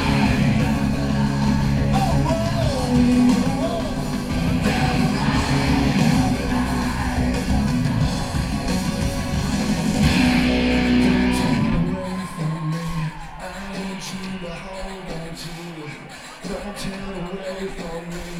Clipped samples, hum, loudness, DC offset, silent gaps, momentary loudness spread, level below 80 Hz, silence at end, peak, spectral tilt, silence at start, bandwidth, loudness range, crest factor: under 0.1%; none; -21 LUFS; under 0.1%; none; 14 LU; -30 dBFS; 0 s; -6 dBFS; -6 dB/octave; 0 s; 15.5 kHz; 12 LU; 16 dB